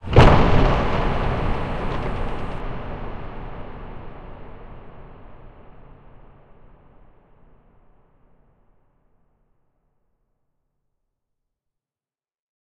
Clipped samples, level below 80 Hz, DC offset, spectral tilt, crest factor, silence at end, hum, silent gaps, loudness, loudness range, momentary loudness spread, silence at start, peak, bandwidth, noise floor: under 0.1%; -28 dBFS; under 0.1%; -7.5 dB/octave; 22 dB; 7.05 s; none; none; -22 LUFS; 26 LU; 28 LU; 0.05 s; -2 dBFS; 8.2 kHz; under -90 dBFS